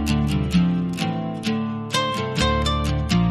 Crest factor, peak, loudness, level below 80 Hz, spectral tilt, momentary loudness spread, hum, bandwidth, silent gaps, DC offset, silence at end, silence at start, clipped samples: 16 dB; -6 dBFS; -22 LUFS; -32 dBFS; -5.5 dB/octave; 5 LU; none; 13.5 kHz; none; under 0.1%; 0 s; 0 s; under 0.1%